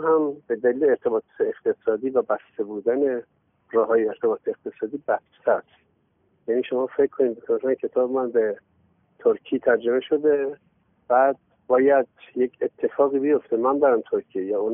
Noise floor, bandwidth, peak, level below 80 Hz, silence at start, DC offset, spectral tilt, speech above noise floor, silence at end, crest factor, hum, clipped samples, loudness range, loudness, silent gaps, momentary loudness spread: -66 dBFS; 3.6 kHz; -6 dBFS; -70 dBFS; 0 s; under 0.1%; -0.5 dB/octave; 44 dB; 0 s; 16 dB; none; under 0.1%; 4 LU; -23 LUFS; none; 8 LU